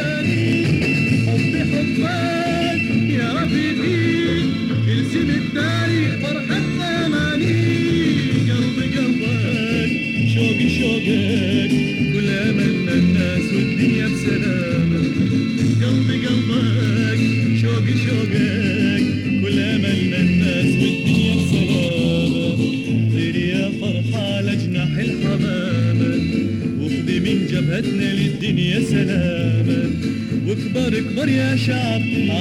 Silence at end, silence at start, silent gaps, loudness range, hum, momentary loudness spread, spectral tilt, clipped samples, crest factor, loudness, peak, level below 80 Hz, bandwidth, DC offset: 0 s; 0 s; none; 2 LU; none; 3 LU; -6.5 dB/octave; under 0.1%; 14 dB; -18 LUFS; -4 dBFS; -42 dBFS; 12.5 kHz; under 0.1%